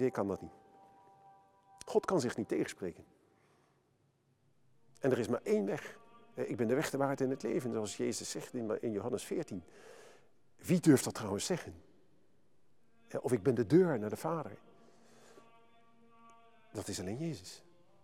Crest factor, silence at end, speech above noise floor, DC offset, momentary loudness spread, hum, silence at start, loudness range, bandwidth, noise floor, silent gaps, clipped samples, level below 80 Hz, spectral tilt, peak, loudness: 22 dB; 0.45 s; 40 dB; under 0.1%; 20 LU; none; 0 s; 5 LU; 17.5 kHz; -74 dBFS; none; under 0.1%; -76 dBFS; -5.5 dB/octave; -14 dBFS; -35 LUFS